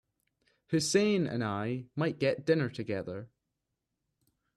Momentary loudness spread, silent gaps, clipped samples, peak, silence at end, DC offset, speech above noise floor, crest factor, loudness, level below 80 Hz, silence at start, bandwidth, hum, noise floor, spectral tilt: 10 LU; none; under 0.1%; -14 dBFS; 1.3 s; under 0.1%; 54 dB; 18 dB; -31 LUFS; -70 dBFS; 0.7 s; 13 kHz; none; -85 dBFS; -5 dB/octave